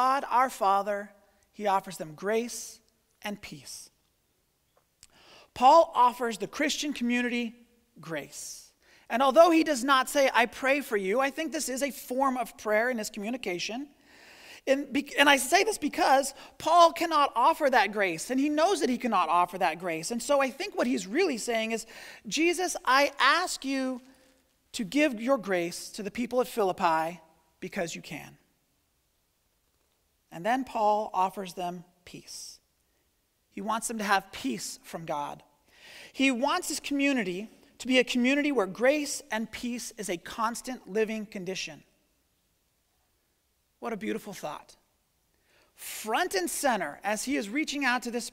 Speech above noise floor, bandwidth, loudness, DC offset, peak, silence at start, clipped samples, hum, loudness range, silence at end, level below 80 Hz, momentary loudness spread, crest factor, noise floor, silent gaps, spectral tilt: 45 dB; 16 kHz; -27 LUFS; under 0.1%; -4 dBFS; 0 s; under 0.1%; none; 12 LU; 0.05 s; -66 dBFS; 17 LU; 24 dB; -73 dBFS; none; -3 dB/octave